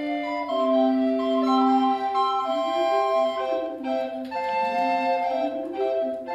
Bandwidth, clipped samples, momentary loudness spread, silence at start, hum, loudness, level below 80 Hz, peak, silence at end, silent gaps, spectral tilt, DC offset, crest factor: 8.2 kHz; under 0.1%; 7 LU; 0 s; none; -24 LUFS; -68 dBFS; -10 dBFS; 0 s; none; -4.5 dB/octave; under 0.1%; 14 dB